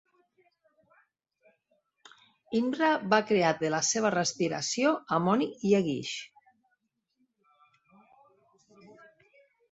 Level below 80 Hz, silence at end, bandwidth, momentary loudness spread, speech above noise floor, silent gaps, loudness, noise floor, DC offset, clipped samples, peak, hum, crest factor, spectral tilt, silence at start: -74 dBFS; 0.8 s; 8.2 kHz; 8 LU; 51 dB; none; -28 LUFS; -78 dBFS; under 0.1%; under 0.1%; -8 dBFS; none; 22 dB; -4 dB/octave; 2.5 s